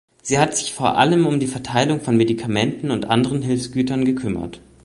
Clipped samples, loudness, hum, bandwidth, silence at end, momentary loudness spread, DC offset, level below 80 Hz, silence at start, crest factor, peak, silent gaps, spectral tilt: under 0.1%; -19 LUFS; none; 11.5 kHz; 0.25 s; 7 LU; under 0.1%; -50 dBFS; 0.25 s; 18 dB; -2 dBFS; none; -5 dB/octave